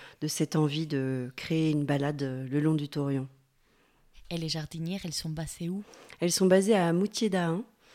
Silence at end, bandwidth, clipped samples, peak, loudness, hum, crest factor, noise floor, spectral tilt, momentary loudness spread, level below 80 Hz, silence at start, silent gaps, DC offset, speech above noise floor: 0.3 s; 16 kHz; under 0.1%; -10 dBFS; -29 LUFS; none; 18 dB; -67 dBFS; -5.5 dB/octave; 12 LU; -60 dBFS; 0 s; none; under 0.1%; 38 dB